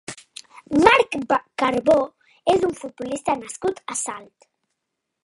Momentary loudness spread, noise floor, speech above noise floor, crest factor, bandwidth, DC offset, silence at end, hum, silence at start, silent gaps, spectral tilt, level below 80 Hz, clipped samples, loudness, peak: 21 LU; -80 dBFS; 58 dB; 22 dB; 11.5 kHz; under 0.1%; 1 s; none; 0.1 s; none; -3.5 dB/octave; -54 dBFS; under 0.1%; -21 LUFS; 0 dBFS